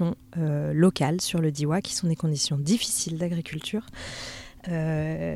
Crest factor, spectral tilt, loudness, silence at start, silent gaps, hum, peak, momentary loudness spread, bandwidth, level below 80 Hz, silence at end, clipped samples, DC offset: 16 dB; -5 dB/octave; -26 LUFS; 0 s; none; none; -10 dBFS; 14 LU; 14.5 kHz; -52 dBFS; 0 s; under 0.1%; under 0.1%